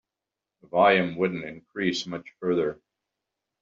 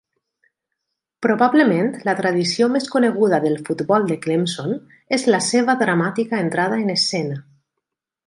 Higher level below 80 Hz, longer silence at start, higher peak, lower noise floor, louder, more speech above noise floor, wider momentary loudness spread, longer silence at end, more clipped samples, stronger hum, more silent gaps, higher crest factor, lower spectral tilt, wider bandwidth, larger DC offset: about the same, -68 dBFS vs -68 dBFS; second, 0.75 s vs 1.2 s; about the same, -6 dBFS vs -4 dBFS; first, -88 dBFS vs -81 dBFS; second, -25 LUFS vs -19 LUFS; about the same, 63 dB vs 62 dB; first, 15 LU vs 8 LU; about the same, 0.85 s vs 0.85 s; neither; neither; neither; first, 22 dB vs 16 dB; second, -3.5 dB/octave vs -5 dB/octave; second, 7.4 kHz vs 11.5 kHz; neither